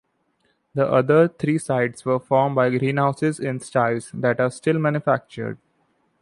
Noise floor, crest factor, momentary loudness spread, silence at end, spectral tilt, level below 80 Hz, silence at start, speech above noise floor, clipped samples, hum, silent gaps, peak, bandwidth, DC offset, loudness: -68 dBFS; 18 dB; 10 LU; 0.65 s; -7 dB/octave; -62 dBFS; 0.75 s; 47 dB; under 0.1%; none; none; -4 dBFS; 11.5 kHz; under 0.1%; -21 LUFS